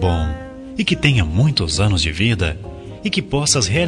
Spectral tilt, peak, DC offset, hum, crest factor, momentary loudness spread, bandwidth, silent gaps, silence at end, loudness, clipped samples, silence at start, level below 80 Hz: -4.5 dB/octave; 0 dBFS; under 0.1%; none; 18 dB; 13 LU; 13.5 kHz; none; 0 s; -18 LUFS; under 0.1%; 0 s; -32 dBFS